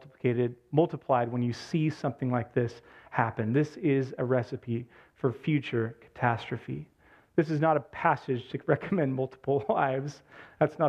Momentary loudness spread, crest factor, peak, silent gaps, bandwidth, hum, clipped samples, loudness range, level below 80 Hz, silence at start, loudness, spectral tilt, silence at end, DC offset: 8 LU; 22 dB; -8 dBFS; none; 8.8 kHz; none; under 0.1%; 2 LU; -66 dBFS; 0 s; -30 LUFS; -8 dB/octave; 0 s; under 0.1%